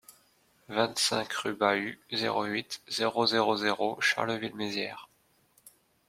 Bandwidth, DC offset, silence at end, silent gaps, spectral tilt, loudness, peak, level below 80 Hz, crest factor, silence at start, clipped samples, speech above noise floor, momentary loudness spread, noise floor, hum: 16.5 kHz; under 0.1%; 0.4 s; none; -3 dB/octave; -29 LUFS; -8 dBFS; -74 dBFS; 22 dB; 0.1 s; under 0.1%; 38 dB; 8 LU; -68 dBFS; none